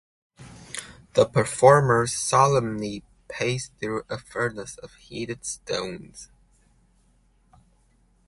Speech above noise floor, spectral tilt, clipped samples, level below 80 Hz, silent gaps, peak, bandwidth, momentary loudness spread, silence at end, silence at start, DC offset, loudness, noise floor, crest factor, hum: 39 dB; -4.5 dB/octave; under 0.1%; -56 dBFS; none; -2 dBFS; 11.5 kHz; 21 LU; 2.05 s; 0.4 s; under 0.1%; -23 LUFS; -62 dBFS; 24 dB; none